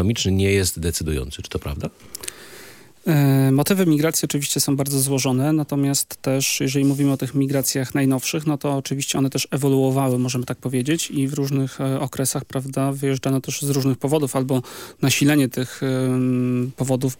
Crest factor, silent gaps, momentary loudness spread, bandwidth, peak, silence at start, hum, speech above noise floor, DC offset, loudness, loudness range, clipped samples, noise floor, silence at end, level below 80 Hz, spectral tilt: 16 dB; none; 9 LU; 17 kHz; -4 dBFS; 0 s; none; 24 dB; under 0.1%; -21 LUFS; 3 LU; under 0.1%; -44 dBFS; 0.05 s; -46 dBFS; -5 dB/octave